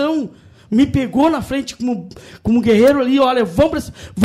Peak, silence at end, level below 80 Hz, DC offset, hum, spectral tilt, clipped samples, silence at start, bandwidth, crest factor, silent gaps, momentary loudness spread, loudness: -4 dBFS; 0 s; -40 dBFS; under 0.1%; none; -6.5 dB/octave; under 0.1%; 0 s; 16 kHz; 12 dB; none; 14 LU; -16 LUFS